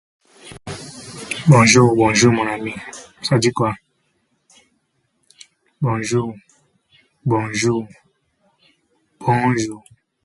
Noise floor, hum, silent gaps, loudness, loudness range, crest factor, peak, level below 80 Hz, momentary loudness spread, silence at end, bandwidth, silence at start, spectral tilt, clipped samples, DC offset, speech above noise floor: -67 dBFS; none; none; -17 LUFS; 10 LU; 20 dB; 0 dBFS; -52 dBFS; 22 LU; 0.45 s; 11.5 kHz; 0.45 s; -5 dB/octave; under 0.1%; under 0.1%; 51 dB